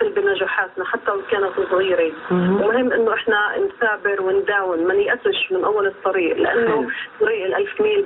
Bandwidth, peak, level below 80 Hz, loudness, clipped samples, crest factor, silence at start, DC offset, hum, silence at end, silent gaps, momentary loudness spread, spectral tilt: 4.1 kHz; -6 dBFS; -58 dBFS; -19 LUFS; under 0.1%; 14 dB; 0 s; under 0.1%; none; 0 s; none; 4 LU; -3 dB/octave